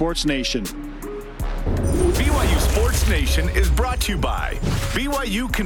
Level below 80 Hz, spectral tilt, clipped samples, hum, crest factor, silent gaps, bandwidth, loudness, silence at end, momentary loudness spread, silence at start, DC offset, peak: -22 dBFS; -4.5 dB/octave; under 0.1%; none; 14 dB; none; 19 kHz; -21 LUFS; 0 s; 12 LU; 0 s; under 0.1%; -6 dBFS